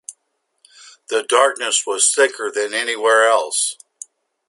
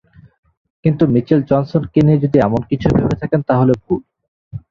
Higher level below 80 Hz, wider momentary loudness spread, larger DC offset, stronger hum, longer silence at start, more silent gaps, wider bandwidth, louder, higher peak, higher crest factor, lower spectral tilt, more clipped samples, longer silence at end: second, -76 dBFS vs -40 dBFS; first, 23 LU vs 8 LU; neither; neither; second, 0.1 s vs 0.85 s; second, none vs 4.28-4.51 s; first, 11.5 kHz vs 7 kHz; about the same, -17 LUFS vs -15 LUFS; about the same, 0 dBFS vs -2 dBFS; about the same, 18 dB vs 14 dB; second, 2 dB/octave vs -10 dB/octave; neither; first, 0.75 s vs 0.1 s